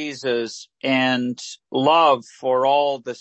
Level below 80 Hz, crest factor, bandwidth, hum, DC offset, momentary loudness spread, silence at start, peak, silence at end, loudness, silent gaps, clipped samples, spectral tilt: -74 dBFS; 16 dB; 8.6 kHz; none; under 0.1%; 12 LU; 0 s; -4 dBFS; 0.05 s; -20 LUFS; none; under 0.1%; -4.5 dB/octave